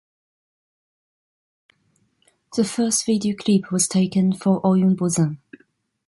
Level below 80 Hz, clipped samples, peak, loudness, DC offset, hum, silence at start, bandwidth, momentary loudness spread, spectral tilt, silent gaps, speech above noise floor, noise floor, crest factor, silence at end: -64 dBFS; under 0.1%; -6 dBFS; -20 LUFS; under 0.1%; none; 2.5 s; 12 kHz; 6 LU; -5.5 dB/octave; none; 46 dB; -66 dBFS; 16 dB; 0.7 s